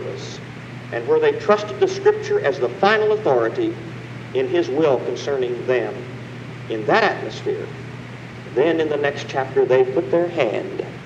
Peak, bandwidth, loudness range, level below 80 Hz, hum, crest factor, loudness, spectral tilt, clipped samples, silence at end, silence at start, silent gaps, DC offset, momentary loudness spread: -2 dBFS; 8.4 kHz; 4 LU; -58 dBFS; none; 18 dB; -20 LUFS; -6 dB/octave; under 0.1%; 0 s; 0 s; none; under 0.1%; 16 LU